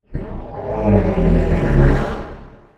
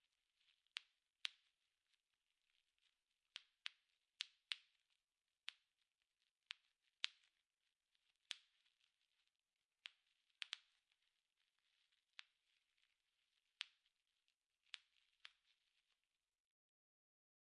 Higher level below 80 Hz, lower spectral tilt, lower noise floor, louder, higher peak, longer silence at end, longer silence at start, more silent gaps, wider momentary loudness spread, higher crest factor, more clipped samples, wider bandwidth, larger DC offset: first, -22 dBFS vs under -90 dBFS; first, -9.5 dB/octave vs 5 dB/octave; second, -37 dBFS vs under -90 dBFS; first, -17 LUFS vs -55 LUFS; first, 0 dBFS vs -18 dBFS; second, 0.3 s vs 2.2 s; second, 0.1 s vs 0.75 s; neither; about the same, 15 LU vs 14 LU; second, 16 dB vs 44 dB; neither; second, 7.8 kHz vs 9 kHz; neither